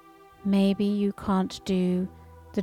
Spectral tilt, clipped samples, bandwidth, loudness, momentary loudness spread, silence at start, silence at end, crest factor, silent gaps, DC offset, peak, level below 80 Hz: -7.5 dB/octave; under 0.1%; 12 kHz; -27 LUFS; 11 LU; 0.45 s; 0 s; 12 dB; none; under 0.1%; -14 dBFS; -54 dBFS